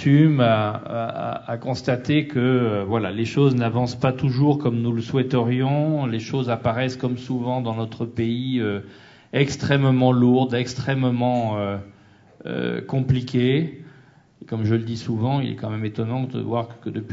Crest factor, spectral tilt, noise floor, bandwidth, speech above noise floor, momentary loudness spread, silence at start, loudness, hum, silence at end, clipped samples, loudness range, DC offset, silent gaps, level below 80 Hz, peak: 18 dB; -7.5 dB/octave; -51 dBFS; 7.8 kHz; 30 dB; 10 LU; 0 s; -22 LUFS; none; 0 s; under 0.1%; 4 LU; under 0.1%; none; -56 dBFS; -4 dBFS